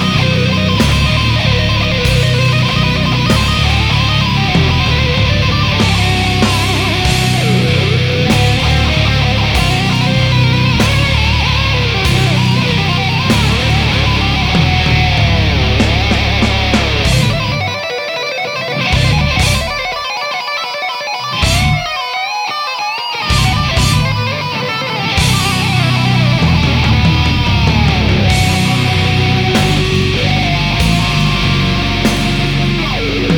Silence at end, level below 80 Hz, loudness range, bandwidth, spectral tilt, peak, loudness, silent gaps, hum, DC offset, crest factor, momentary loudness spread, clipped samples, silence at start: 0 s; -22 dBFS; 3 LU; 18 kHz; -5 dB/octave; 0 dBFS; -12 LUFS; none; none; under 0.1%; 12 dB; 6 LU; under 0.1%; 0 s